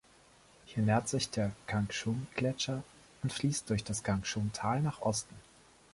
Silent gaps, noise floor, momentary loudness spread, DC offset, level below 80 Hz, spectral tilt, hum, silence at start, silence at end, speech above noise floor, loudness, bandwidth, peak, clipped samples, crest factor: none; -62 dBFS; 8 LU; under 0.1%; -58 dBFS; -5 dB/octave; none; 0.65 s; 0.55 s; 28 dB; -34 LUFS; 11.5 kHz; -16 dBFS; under 0.1%; 18 dB